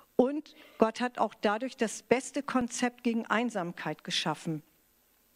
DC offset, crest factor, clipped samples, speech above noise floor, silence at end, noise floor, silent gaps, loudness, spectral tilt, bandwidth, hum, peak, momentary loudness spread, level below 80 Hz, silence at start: under 0.1%; 24 dB; under 0.1%; 37 dB; 0.75 s; -68 dBFS; none; -31 LUFS; -4 dB/octave; 15.5 kHz; none; -8 dBFS; 7 LU; -70 dBFS; 0.2 s